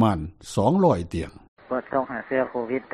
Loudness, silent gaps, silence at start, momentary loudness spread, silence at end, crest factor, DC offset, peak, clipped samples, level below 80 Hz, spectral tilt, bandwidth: -25 LUFS; 1.48-1.57 s; 0 s; 12 LU; 0.1 s; 18 dB; under 0.1%; -8 dBFS; under 0.1%; -46 dBFS; -7 dB/octave; 13 kHz